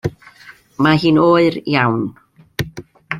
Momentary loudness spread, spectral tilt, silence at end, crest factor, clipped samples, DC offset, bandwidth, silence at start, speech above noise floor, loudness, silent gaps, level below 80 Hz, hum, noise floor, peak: 16 LU; -7 dB/octave; 0 s; 16 dB; under 0.1%; under 0.1%; 14 kHz; 0.05 s; 30 dB; -15 LUFS; none; -48 dBFS; none; -44 dBFS; -2 dBFS